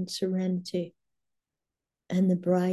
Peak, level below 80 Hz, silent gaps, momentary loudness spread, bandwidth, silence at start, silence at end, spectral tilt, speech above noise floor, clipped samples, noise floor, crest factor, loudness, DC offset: -12 dBFS; -74 dBFS; none; 9 LU; 12.5 kHz; 0 s; 0 s; -7 dB/octave; 62 dB; under 0.1%; -89 dBFS; 16 dB; -29 LUFS; under 0.1%